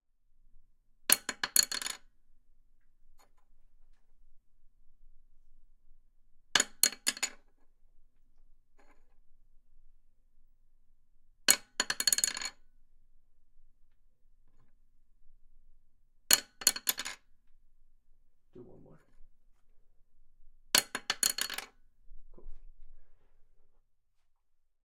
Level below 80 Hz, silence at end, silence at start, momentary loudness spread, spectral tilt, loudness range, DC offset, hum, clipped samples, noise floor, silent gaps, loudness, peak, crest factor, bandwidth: -58 dBFS; 1.2 s; 0.55 s; 13 LU; 1.5 dB/octave; 9 LU; under 0.1%; none; under 0.1%; -70 dBFS; none; -29 LUFS; -2 dBFS; 36 dB; 16.5 kHz